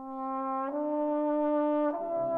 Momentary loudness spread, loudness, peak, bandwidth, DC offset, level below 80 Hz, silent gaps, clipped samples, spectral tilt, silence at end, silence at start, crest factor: 5 LU; -30 LUFS; -20 dBFS; 3.8 kHz; under 0.1%; -72 dBFS; none; under 0.1%; -9 dB/octave; 0 s; 0 s; 10 dB